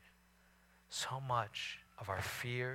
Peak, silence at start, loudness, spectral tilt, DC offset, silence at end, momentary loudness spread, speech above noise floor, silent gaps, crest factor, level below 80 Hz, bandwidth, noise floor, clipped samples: -22 dBFS; 0.05 s; -41 LUFS; -3.5 dB/octave; under 0.1%; 0 s; 8 LU; 28 dB; none; 22 dB; -70 dBFS; 17 kHz; -69 dBFS; under 0.1%